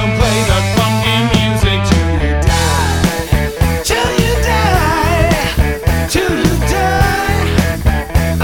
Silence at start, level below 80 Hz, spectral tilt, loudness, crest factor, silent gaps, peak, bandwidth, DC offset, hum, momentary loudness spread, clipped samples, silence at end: 0 s; -18 dBFS; -5 dB/octave; -13 LUFS; 12 dB; none; 0 dBFS; 19.5 kHz; under 0.1%; none; 3 LU; under 0.1%; 0 s